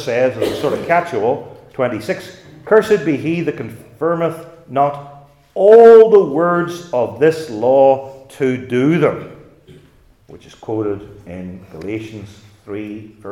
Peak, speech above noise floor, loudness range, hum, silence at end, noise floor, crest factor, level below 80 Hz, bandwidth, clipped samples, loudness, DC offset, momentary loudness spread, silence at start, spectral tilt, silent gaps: 0 dBFS; 34 dB; 16 LU; none; 0 s; -49 dBFS; 16 dB; -56 dBFS; 12.5 kHz; under 0.1%; -14 LUFS; under 0.1%; 21 LU; 0 s; -7 dB/octave; none